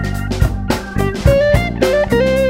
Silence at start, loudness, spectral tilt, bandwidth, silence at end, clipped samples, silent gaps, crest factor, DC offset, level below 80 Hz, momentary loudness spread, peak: 0 s; -15 LUFS; -6.5 dB/octave; 16.5 kHz; 0 s; under 0.1%; none; 14 dB; under 0.1%; -22 dBFS; 7 LU; 0 dBFS